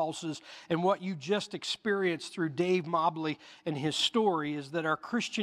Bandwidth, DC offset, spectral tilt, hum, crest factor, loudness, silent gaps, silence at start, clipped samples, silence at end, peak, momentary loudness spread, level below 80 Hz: 14 kHz; under 0.1%; -4.5 dB/octave; none; 18 dB; -31 LUFS; none; 0 s; under 0.1%; 0 s; -14 dBFS; 9 LU; -78 dBFS